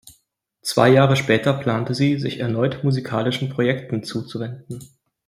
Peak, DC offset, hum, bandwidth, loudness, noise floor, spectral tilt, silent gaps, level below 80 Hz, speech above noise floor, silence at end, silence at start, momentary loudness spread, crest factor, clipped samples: -2 dBFS; under 0.1%; none; 15 kHz; -20 LUFS; -66 dBFS; -6 dB/octave; none; -58 dBFS; 47 dB; 0.4 s; 0.05 s; 15 LU; 18 dB; under 0.1%